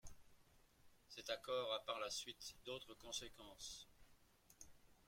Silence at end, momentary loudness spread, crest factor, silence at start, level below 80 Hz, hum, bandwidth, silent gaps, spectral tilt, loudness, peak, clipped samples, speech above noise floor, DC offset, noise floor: 0.05 s; 20 LU; 22 dB; 0.05 s; -72 dBFS; none; 16.5 kHz; none; -1.5 dB/octave; -49 LUFS; -30 dBFS; under 0.1%; 22 dB; under 0.1%; -72 dBFS